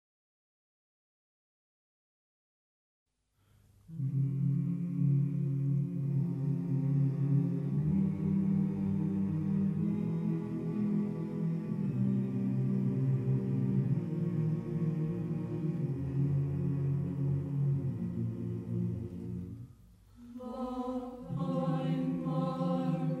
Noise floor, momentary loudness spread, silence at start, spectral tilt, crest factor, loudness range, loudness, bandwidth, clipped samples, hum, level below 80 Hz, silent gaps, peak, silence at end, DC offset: -70 dBFS; 7 LU; 3.9 s; -10.5 dB/octave; 14 dB; 7 LU; -33 LUFS; 4.3 kHz; under 0.1%; none; -62 dBFS; none; -20 dBFS; 0 s; under 0.1%